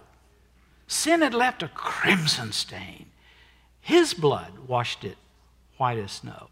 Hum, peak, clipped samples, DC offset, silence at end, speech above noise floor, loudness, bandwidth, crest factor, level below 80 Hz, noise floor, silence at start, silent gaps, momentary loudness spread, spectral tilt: none; -6 dBFS; under 0.1%; under 0.1%; 0.05 s; 34 dB; -24 LUFS; 16 kHz; 20 dB; -60 dBFS; -59 dBFS; 0.9 s; none; 17 LU; -3.5 dB/octave